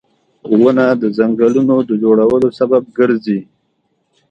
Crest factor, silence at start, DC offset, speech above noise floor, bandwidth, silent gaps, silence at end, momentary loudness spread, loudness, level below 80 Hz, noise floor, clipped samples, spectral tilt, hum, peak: 14 dB; 0.45 s; under 0.1%; 52 dB; 7.6 kHz; none; 0.9 s; 5 LU; -13 LUFS; -54 dBFS; -64 dBFS; under 0.1%; -8.5 dB/octave; none; 0 dBFS